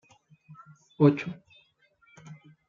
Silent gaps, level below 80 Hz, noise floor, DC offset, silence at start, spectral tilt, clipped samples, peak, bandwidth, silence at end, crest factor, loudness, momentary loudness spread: none; -76 dBFS; -65 dBFS; under 0.1%; 0.5 s; -9 dB/octave; under 0.1%; -8 dBFS; 7.2 kHz; 0.35 s; 24 dB; -25 LUFS; 27 LU